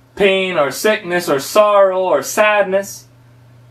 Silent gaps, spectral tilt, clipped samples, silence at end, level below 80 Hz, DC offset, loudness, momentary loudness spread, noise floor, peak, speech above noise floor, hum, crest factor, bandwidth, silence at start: none; -3.5 dB/octave; under 0.1%; 0.7 s; -56 dBFS; under 0.1%; -14 LUFS; 7 LU; -45 dBFS; 0 dBFS; 31 dB; none; 16 dB; 15 kHz; 0.15 s